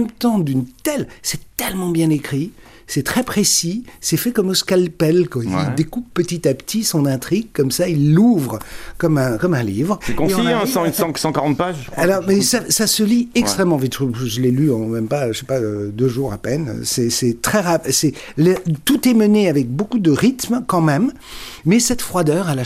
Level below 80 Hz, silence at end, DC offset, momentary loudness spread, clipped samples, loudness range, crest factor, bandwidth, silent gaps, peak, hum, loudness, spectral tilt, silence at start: -44 dBFS; 0 s; under 0.1%; 8 LU; under 0.1%; 3 LU; 14 dB; 16 kHz; none; -2 dBFS; none; -17 LUFS; -5 dB/octave; 0 s